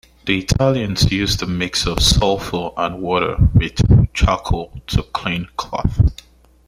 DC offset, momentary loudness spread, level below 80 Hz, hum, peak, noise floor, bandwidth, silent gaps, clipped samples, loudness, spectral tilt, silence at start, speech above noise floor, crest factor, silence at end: under 0.1%; 9 LU; -26 dBFS; none; 0 dBFS; -44 dBFS; 15.5 kHz; none; under 0.1%; -18 LUFS; -5 dB/octave; 0.25 s; 28 dB; 16 dB; 0.55 s